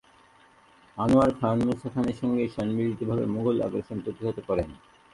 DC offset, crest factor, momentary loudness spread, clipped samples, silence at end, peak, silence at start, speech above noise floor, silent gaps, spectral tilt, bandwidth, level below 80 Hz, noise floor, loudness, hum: under 0.1%; 18 dB; 11 LU; under 0.1%; 0.4 s; -10 dBFS; 0.95 s; 31 dB; none; -8.5 dB/octave; 11.5 kHz; -50 dBFS; -57 dBFS; -27 LUFS; none